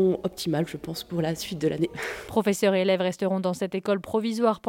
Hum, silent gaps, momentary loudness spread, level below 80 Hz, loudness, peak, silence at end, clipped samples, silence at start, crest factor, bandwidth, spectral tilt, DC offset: none; none; 6 LU; -58 dBFS; -26 LUFS; -8 dBFS; 0 s; under 0.1%; 0 s; 16 dB; 17 kHz; -5.5 dB/octave; under 0.1%